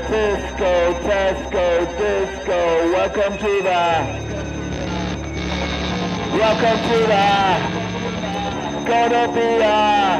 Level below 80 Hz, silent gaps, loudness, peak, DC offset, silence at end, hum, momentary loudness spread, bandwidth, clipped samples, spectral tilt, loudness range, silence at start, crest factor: -36 dBFS; none; -19 LUFS; -4 dBFS; under 0.1%; 0 s; none; 9 LU; 11 kHz; under 0.1%; -5 dB/octave; 3 LU; 0 s; 14 dB